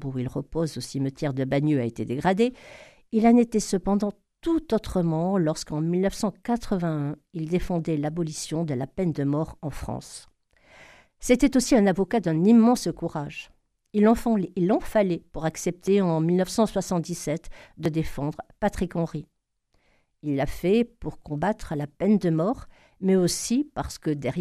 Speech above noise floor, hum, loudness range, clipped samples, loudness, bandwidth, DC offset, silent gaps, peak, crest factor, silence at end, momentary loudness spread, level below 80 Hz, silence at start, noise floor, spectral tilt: 45 dB; none; 6 LU; under 0.1%; -25 LUFS; 14.5 kHz; under 0.1%; none; -6 dBFS; 18 dB; 0 s; 12 LU; -46 dBFS; 0 s; -70 dBFS; -6.5 dB/octave